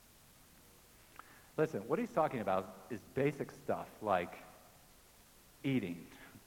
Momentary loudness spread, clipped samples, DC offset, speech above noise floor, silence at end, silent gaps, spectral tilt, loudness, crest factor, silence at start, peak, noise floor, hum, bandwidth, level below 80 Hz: 21 LU; under 0.1%; under 0.1%; 26 dB; 0.1 s; none; -6.5 dB/octave; -38 LUFS; 22 dB; 1.25 s; -18 dBFS; -63 dBFS; none; 18 kHz; -70 dBFS